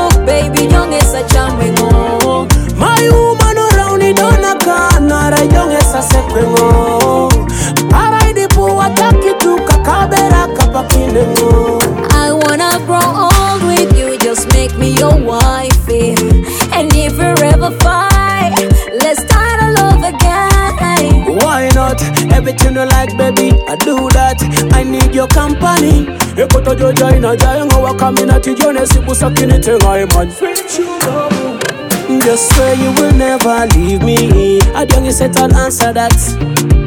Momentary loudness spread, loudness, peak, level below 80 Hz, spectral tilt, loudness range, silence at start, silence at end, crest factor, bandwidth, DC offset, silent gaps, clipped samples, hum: 3 LU; -10 LUFS; 0 dBFS; -14 dBFS; -5 dB/octave; 1 LU; 0 s; 0 s; 8 dB; over 20 kHz; under 0.1%; none; 0.5%; none